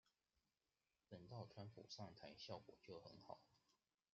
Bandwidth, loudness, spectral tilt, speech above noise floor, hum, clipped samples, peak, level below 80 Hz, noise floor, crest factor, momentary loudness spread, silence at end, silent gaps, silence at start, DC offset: 7.2 kHz; -60 LUFS; -4.5 dB/octave; over 30 dB; none; under 0.1%; -38 dBFS; -88 dBFS; under -90 dBFS; 24 dB; 7 LU; 0.4 s; none; 0.05 s; under 0.1%